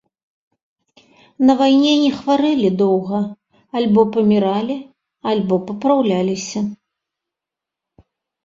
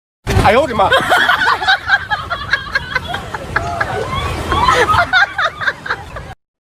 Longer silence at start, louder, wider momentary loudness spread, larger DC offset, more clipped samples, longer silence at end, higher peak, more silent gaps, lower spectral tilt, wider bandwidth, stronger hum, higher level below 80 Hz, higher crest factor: first, 1.4 s vs 0.25 s; second, -17 LUFS vs -14 LUFS; about the same, 12 LU vs 11 LU; neither; neither; first, 1.7 s vs 0.45 s; about the same, -2 dBFS vs 0 dBFS; neither; first, -6 dB/octave vs -4 dB/octave; second, 7.6 kHz vs 16 kHz; neither; second, -60 dBFS vs -30 dBFS; about the same, 16 dB vs 16 dB